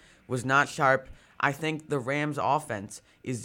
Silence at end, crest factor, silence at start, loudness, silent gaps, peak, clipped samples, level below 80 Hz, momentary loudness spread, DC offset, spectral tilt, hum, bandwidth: 0 s; 22 dB; 0.3 s; -28 LUFS; none; -8 dBFS; under 0.1%; -60 dBFS; 12 LU; under 0.1%; -5 dB/octave; none; 16.5 kHz